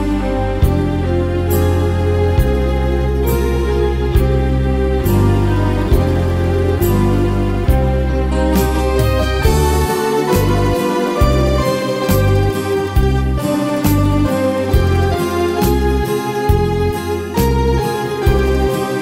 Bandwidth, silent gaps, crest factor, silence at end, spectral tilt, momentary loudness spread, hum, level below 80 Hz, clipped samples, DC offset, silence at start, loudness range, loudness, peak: 16 kHz; none; 14 dB; 0 s; -6.5 dB/octave; 3 LU; none; -20 dBFS; under 0.1%; under 0.1%; 0 s; 1 LU; -15 LUFS; 0 dBFS